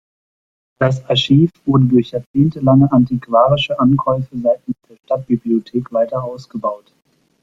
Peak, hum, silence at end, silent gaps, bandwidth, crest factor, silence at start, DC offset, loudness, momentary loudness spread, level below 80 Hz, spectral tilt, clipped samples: -2 dBFS; none; 0.65 s; 2.26-2.34 s; 7.6 kHz; 14 dB; 0.8 s; under 0.1%; -16 LUFS; 11 LU; -50 dBFS; -8 dB/octave; under 0.1%